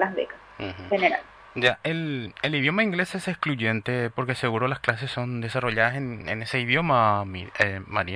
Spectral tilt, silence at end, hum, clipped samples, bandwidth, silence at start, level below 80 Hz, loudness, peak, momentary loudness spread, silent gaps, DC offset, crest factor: -6 dB/octave; 0 s; none; under 0.1%; 11 kHz; 0 s; -56 dBFS; -25 LUFS; -4 dBFS; 9 LU; none; under 0.1%; 22 dB